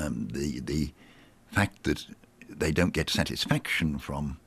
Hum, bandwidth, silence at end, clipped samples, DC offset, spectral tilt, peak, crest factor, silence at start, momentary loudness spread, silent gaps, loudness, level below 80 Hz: none; 15.5 kHz; 0.1 s; under 0.1%; under 0.1%; -5 dB/octave; -12 dBFS; 20 dB; 0 s; 8 LU; none; -29 LUFS; -46 dBFS